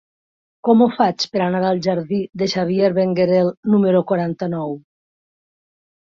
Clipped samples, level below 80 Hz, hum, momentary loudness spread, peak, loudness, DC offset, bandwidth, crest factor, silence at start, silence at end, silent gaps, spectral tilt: under 0.1%; -60 dBFS; none; 9 LU; -2 dBFS; -18 LUFS; under 0.1%; 7.6 kHz; 16 dB; 0.65 s; 1.25 s; 3.57-3.63 s; -7 dB/octave